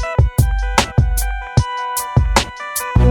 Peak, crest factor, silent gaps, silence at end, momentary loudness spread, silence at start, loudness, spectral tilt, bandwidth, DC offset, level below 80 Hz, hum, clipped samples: 0 dBFS; 16 dB; none; 0 s; 6 LU; 0 s; -17 LUFS; -4.5 dB/octave; 19 kHz; under 0.1%; -20 dBFS; none; under 0.1%